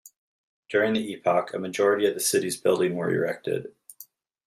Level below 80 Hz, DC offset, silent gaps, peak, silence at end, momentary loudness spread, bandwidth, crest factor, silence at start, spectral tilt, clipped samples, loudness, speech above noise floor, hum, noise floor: -72 dBFS; under 0.1%; 0.16-0.63 s; -8 dBFS; 0.45 s; 9 LU; 15.5 kHz; 18 dB; 0.05 s; -4 dB/octave; under 0.1%; -25 LUFS; 27 dB; none; -52 dBFS